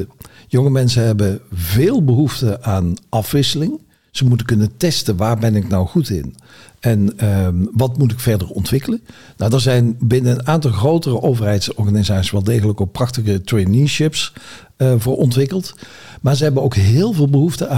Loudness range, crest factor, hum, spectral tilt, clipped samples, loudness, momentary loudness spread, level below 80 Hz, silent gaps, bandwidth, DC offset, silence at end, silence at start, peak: 2 LU; 12 dB; none; -6.5 dB/octave; under 0.1%; -16 LUFS; 8 LU; -42 dBFS; none; 16.5 kHz; 0.6%; 0 s; 0 s; -4 dBFS